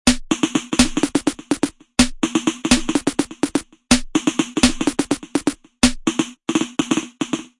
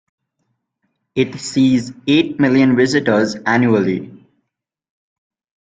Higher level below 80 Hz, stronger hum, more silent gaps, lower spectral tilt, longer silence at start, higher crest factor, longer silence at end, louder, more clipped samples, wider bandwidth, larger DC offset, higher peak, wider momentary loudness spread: first, -36 dBFS vs -56 dBFS; neither; neither; second, -3 dB/octave vs -6 dB/octave; second, 0.05 s vs 1.15 s; about the same, 20 dB vs 16 dB; second, 0.15 s vs 1.45 s; second, -20 LUFS vs -16 LUFS; neither; first, 11.5 kHz vs 9.2 kHz; neither; about the same, 0 dBFS vs -2 dBFS; about the same, 6 LU vs 8 LU